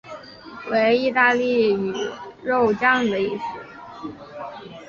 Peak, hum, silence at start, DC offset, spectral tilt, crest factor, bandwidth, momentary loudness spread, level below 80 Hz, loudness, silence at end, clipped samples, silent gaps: -4 dBFS; none; 0.05 s; under 0.1%; -5 dB/octave; 18 dB; 7.2 kHz; 19 LU; -60 dBFS; -20 LUFS; 0 s; under 0.1%; none